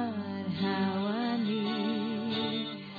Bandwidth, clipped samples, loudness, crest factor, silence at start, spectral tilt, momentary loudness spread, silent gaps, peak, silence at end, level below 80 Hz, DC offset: 5 kHz; under 0.1%; -32 LUFS; 12 dB; 0 s; -8 dB/octave; 5 LU; none; -20 dBFS; 0 s; -72 dBFS; under 0.1%